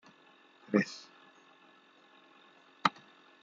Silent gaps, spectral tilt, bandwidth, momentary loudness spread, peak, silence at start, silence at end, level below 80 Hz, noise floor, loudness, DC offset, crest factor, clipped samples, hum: none; -5 dB/octave; 7.6 kHz; 24 LU; -8 dBFS; 0.7 s; 0.55 s; -88 dBFS; -62 dBFS; -33 LUFS; under 0.1%; 30 dB; under 0.1%; none